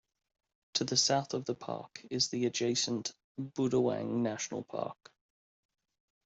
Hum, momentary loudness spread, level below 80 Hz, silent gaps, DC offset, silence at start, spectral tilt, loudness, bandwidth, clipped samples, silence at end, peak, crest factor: none; 13 LU; -74 dBFS; 3.24-3.35 s; under 0.1%; 0.75 s; -3.5 dB/octave; -33 LUFS; 8.2 kHz; under 0.1%; 1.35 s; -14 dBFS; 22 dB